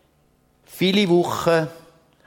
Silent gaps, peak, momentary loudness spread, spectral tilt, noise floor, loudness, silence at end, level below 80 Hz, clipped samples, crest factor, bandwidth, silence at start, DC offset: none; -4 dBFS; 6 LU; -5.5 dB/octave; -61 dBFS; -20 LUFS; 0.5 s; -58 dBFS; under 0.1%; 18 dB; 17.5 kHz; 0.7 s; under 0.1%